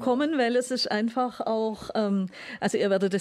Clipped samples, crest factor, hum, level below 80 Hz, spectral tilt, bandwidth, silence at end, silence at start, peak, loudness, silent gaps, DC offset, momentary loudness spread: under 0.1%; 12 dB; none; -66 dBFS; -5 dB/octave; 13.5 kHz; 0 s; 0 s; -14 dBFS; -27 LUFS; none; under 0.1%; 5 LU